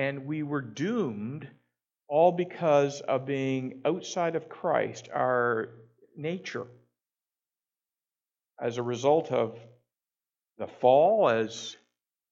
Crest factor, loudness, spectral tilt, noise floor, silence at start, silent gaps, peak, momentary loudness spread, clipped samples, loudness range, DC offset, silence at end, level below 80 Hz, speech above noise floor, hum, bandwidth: 22 dB; -28 LUFS; -6 dB/octave; under -90 dBFS; 0 s; none; -8 dBFS; 15 LU; under 0.1%; 7 LU; under 0.1%; 0.6 s; -80 dBFS; over 62 dB; none; 7.8 kHz